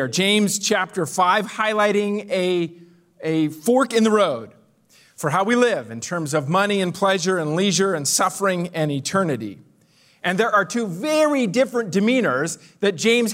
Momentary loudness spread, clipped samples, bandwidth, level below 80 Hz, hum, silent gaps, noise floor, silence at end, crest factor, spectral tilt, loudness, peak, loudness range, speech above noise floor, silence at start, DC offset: 7 LU; under 0.1%; 16 kHz; -70 dBFS; none; none; -57 dBFS; 0 s; 16 dB; -4 dB/octave; -20 LUFS; -4 dBFS; 2 LU; 37 dB; 0 s; under 0.1%